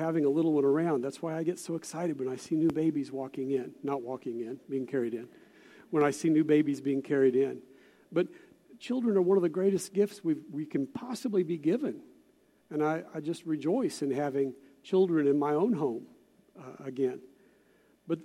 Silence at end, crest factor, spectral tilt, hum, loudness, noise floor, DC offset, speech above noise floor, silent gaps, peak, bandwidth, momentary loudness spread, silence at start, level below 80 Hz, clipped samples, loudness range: 0 s; 18 dB; -7 dB/octave; none; -30 LUFS; -65 dBFS; under 0.1%; 36 dB; none; -12 dBFS; 14 kHz; 11 LU; 0 s; -78 dBFS; under 0.1%; 4 LU